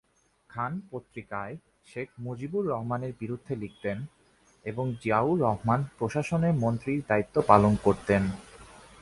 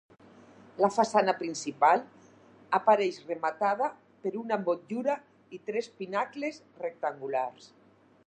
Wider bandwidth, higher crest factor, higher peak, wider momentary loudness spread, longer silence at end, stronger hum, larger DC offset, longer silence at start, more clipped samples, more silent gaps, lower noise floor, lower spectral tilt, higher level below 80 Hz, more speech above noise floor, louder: about the same, 11.5 kHz vs 10.5 kHz; first, 26 dB vs 20 dB; first, -4 dBFS vs -10 dBFS; first, 17 LU vs 13 LU; second, 0.25 s vs 0.6 s; neither; neither; second, 0.55 s vs 0.75 s; neither; neither; first, -62 dBFS vs -57 dBFS; first, -8 dB/octave vs -4.5 dB/octave; first, -52 dBFS vs -82 dBFS; first, 35 dB vs 28 dB; about the same, -28 LUFS vs -30 LUFS